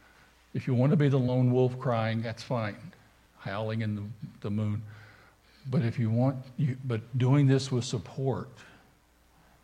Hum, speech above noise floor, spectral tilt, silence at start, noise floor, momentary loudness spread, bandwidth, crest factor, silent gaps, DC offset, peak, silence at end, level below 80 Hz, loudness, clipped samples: none; 35 dB; -7.5 dB/octave; 0.55 s; -63 dBFS; 15 LU; 9.8 kHz; 18 dB; none; under 0.1%; -12 dBFS; 1 s; -66 dBFS; -29 LUFS; under 0.1%